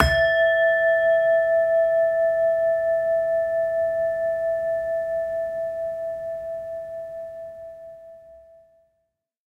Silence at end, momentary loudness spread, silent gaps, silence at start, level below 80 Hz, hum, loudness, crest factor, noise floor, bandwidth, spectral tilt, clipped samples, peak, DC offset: 1.15 s; 16 LU; none; 0 s; -42 dBFS; none; -22 LUFS; 22 dB; -76 dBFS; 10.5 kHz; -5 dB/octave; under 0.1%; 0 dBFS; under 0.1%